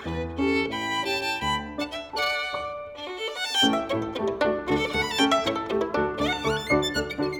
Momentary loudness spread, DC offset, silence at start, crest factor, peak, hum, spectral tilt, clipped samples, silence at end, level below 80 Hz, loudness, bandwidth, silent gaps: 10 LU; under 0.1%; 0 s; 18 dB; -8 dBFS; none; -4 dB/octave; under 0.1%; 0 s; -46 dBFS; -26 LUFS; over 20 kHz; none